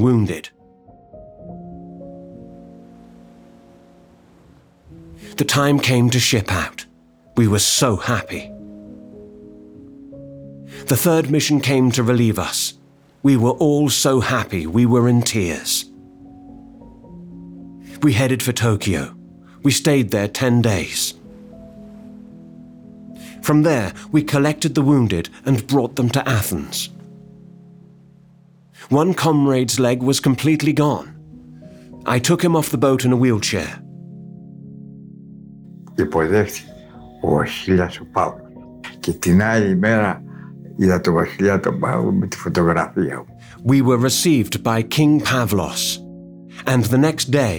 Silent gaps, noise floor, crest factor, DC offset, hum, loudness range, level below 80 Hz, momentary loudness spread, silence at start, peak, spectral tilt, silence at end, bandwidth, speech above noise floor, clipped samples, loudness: none; -50 dBFS; 16 dB; under 0.1%; none; 6 LU; -48 dBFS; 23 LU; 0 s; -2 dBFS; -5 dB/octave; 0 s; over 20 kHz; 33 dB; under 0.1%; -18 LUFS